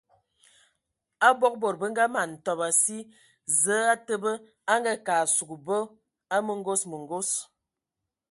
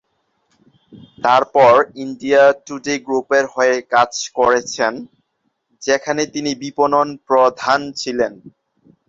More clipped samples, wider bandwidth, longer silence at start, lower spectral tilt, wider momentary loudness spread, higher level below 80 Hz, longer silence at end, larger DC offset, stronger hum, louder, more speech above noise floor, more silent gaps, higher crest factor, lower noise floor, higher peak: neither; first, 12 kHz vs 7.8 kHz; first, 1.2 s vs 0.95 s; second, -2 dB/octave vs -3.5 dB/octave; about the same, 9 LU vs 11 LU; second, -78 dBFS vs -60 dBFS; first, 0.85 s vs 0.6 s; neither; neither; second, -26 LUFS vs -16 LUFS; first, 60 dB vs 54 dB; neither; first, 22 dB vs 16 dB; first, -87 dBFS vs -70 dBFS; second, -6 dBFS vs -2 dBFS